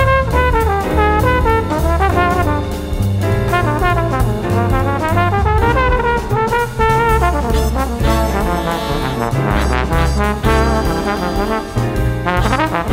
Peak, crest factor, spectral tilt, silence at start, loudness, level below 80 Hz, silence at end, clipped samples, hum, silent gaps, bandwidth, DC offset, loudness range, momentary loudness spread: 0 dBFS; 14 dB; -6.5 dB/octave; 0 s; -15 LUFS; -20 dBFS; 0 s; under 0.1%; none; none; 16.5 kHz; under 0.1%; 2 LU; 5 LU